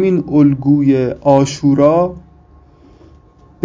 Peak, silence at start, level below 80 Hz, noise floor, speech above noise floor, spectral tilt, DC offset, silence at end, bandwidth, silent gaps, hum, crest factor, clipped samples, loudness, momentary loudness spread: 0 dBFS; 0 s; -44 dBFS; -45 dBFS; 33 dB; -7.5 dB/octave; under 0.1%; 1.45 s; 7.8 kHz; none; none; 14 dB; under 0.1%; -13 LUFS; 3 LU